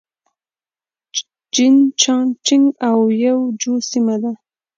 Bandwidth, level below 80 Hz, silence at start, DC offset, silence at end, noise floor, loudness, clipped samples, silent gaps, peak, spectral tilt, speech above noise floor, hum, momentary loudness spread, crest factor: 7.6 kHz; -74 dBFS; 1.15 s; under 0.1%; 0.4 s; under -90 dBFS; -16 LUFS; under 0.1%; none; 0 dBFS; -3 dB/octave; over 75 dB; none; 13 LU; 16 dB